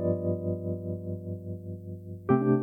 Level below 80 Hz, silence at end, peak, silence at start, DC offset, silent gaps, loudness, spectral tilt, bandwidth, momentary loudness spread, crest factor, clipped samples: -66 dBFS; 0 s; -12 dBFS; 0 s; under 0.1%; none; -32 LUFS; -12 dB/octave; 3.3 kHz; 14 LU; 18 dB; under 0.1%